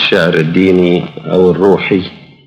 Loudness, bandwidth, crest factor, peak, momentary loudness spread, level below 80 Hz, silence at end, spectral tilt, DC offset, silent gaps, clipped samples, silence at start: -11 LUFS; 9.6 kHz; 10 dB; 0 dBFS; 7 LU; -52 dBFS; 0.3 s; -7 dB/octave; under 0.1%; none; under 0.1%; 0 s